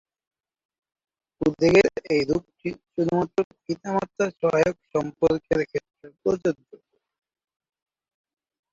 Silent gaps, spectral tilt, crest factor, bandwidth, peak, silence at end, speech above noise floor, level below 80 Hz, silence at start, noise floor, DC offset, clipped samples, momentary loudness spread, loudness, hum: 3.44-3.51 s; -6.5 dB/octave; 22 dB; 7.8 kHz; -4 dBFS; 2.2 s; 30 dB; -56 dBFS; 1.4 s; -53 dBFS; under 0.1%; under 0.1%; 13 LU; -24 LUFS; none